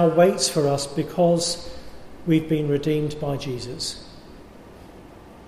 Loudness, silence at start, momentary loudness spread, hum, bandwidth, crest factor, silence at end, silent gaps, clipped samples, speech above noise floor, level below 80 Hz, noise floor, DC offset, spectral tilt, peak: -23 LUFS; 0 s; 16 LU; none; 15 kHz; 18 dB; 0 s; none; under 0.1%; 23 dB; -50 dBFS; -44 dBFS; under 0.1%; -5 dB/octave; -4 dBFS